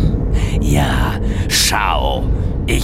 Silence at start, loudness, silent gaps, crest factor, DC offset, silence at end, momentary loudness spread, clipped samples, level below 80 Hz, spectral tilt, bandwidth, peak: 0 s; -16 LUFS; none; 14 dB; under 0.1%; 0 s; 6 LU; under 0.1%; -18 dBFS; -4 dB/octave; 16 kHz; -2 dBFS